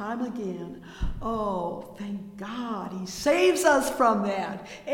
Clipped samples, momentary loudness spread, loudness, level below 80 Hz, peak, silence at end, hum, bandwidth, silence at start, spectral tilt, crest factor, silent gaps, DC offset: under 0.1%; 15 LU; -27 LUFS; -42 dBFS; -8 dBFS; 0 s; none; 17 kHz; 0 s; -4.5 dB/octave; 18 dB; none; under 0.1%